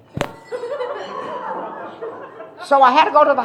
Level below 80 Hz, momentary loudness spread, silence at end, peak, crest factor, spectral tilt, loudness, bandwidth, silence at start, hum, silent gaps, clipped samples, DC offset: -56 dBFS; 20 LU; 0 s; 0 dBFS; 18 dB; -5 dB/octave; -18 LUFS; 12 kHz; 0.15 s; none; none; under 0.1%; under 0.1%